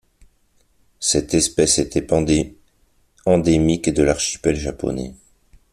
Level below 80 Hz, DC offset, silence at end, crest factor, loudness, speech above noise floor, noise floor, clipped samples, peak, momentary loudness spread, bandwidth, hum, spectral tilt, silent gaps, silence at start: -38 dBFS; under 0.1%; 0.6 s; 18 dB; -19 LUFS; 42 dB; -60 dBFS; under 0.1%; -2 dBFS; 10 LU; 13.5 kHz; none; -4.5 dB/octave; none; 1 s